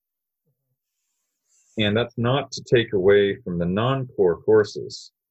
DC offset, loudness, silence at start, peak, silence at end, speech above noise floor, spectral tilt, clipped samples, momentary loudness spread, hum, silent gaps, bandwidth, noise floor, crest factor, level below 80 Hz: under 0.1%; -21 LUFS; 1.75 s; -6 dBFS; 0.25 s; 57 dB; -6 dB/octave; under 0.1%; 13 LU; none; none; 8.2 kHz; -78 dBFS; 16 dB; -52 dBFS